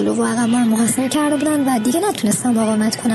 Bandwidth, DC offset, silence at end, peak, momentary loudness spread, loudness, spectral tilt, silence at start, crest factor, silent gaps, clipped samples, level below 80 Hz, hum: 12.5 kHz; under 0.1%; 0 s; -6 dBFS; 2 LU; -17 LUFS; -4.5 dB/octave; 0 s; 10 dB; none; under 0.1%; -58 dBFS; none